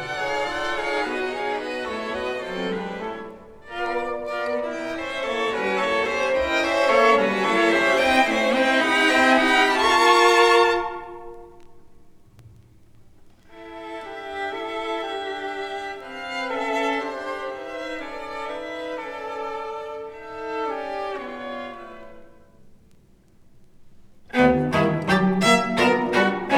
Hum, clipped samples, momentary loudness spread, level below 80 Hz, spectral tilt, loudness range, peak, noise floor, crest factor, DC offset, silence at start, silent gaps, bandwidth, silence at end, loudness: none; under 0.1%; 17 LU; -52 dBFS; -4 dB/octave; 16 LU; -4 dBFS; -53 dBFS; 20 dB; under 0.1%; 0 s; none; 18.5 kHz; 0 s; -22 LUFS